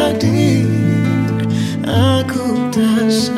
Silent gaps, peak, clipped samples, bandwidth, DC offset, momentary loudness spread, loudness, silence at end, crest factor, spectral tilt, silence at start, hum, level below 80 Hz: none; -2 dBFS; under 0.1%; 14.5 kHz; under 0.1%; 4 LU; -15 LUFS; 0 s; 12 dB; -6.5 dB/octave; 0 s; none; -48 dBFS